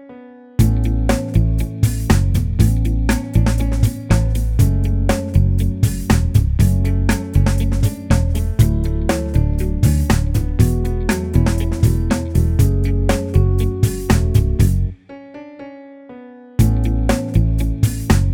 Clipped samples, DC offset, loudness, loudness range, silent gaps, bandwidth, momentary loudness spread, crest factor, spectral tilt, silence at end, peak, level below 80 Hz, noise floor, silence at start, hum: under 0.1%; under 0.1%; -17 LUFS; 3 LU; none; 18 kHz; 4 LU; 16 dB; -7 dB/octave; 0 s; 0 dBFS; -20 dBFS; -39 dBFS; 0 s; none